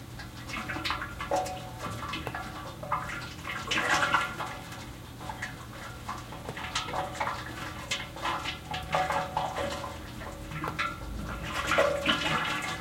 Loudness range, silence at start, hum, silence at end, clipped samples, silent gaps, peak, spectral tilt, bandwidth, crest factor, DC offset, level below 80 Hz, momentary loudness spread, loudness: 5 LU; 0 s; none; 0 s; under 0.1%; none; -8 dBFS; -3.5 dB/octave; 16.5 kHz; 24 dB; under 0.1%; -50 dBFS; 14 LU; -32 LUFS